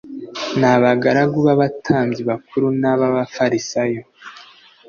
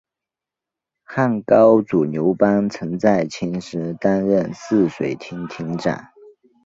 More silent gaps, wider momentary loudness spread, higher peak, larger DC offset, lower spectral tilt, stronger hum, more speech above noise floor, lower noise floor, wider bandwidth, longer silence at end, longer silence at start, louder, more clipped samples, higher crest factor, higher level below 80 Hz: neither; about the same, 14 LU vs 13 LU; about the same, -2 dBFS vs -2 dBFS; neither; second, -6 dB/octave vs -7.5 dB/octave; neither; second, 28 dB vs 69 dB; second, -45 dBFS vs -87 dBFS; about the same, 7.2 kHz vs 7.8 kHz; second, 0.45 s vs 0.65 s; second, 0.05 s vs 1.1 s; about the same, -17 LUFS vs -19 LUFS; neither; about the same, 16 dB vs 18 dB; about the same, -56 dBFS vs -56 dBFS